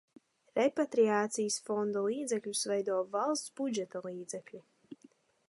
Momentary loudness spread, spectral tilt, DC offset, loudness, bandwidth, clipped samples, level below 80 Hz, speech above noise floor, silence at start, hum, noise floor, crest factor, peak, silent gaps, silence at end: 13 LU; -3.5 dB/octave; under 0.1%; -33 LUFS; 11.5 kHz; under 0.1%; -86 dBFS; 31 dB; 0.55 s; none; -64 dBFS; 18 dB; -16 dBFS; none; 0.55 s